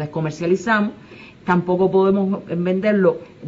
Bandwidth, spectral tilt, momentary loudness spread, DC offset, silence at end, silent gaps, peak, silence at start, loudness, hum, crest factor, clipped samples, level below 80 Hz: 7.8 kHz; -7.5 dB/octave; 8 LU; under 0.1%; 0 s; none; -2 dBFS; 0 s; -19 LUFS; none; 16 dB; under 0.1%; -56 dBFS